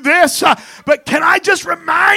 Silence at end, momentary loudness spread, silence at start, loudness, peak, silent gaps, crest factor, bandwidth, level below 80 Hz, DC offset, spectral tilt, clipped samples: 0 s; 6 LU; 0 s; -13 LUFS; 0 dBFS; none; 12 dB; 16.5 kHz; -54 dBFS; under 0.1%; -2 dB/octave; 0.2%